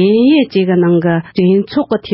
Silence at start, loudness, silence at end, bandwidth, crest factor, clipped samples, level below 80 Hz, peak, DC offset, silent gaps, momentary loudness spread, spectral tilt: 0 s; -12 LUFS; 0 s; 5.8 kHz; 10 dB; under 0.1%; -52 dBFS; 0 dBFS; under 0.1%; none; 6 LU; -12.5 dB/octave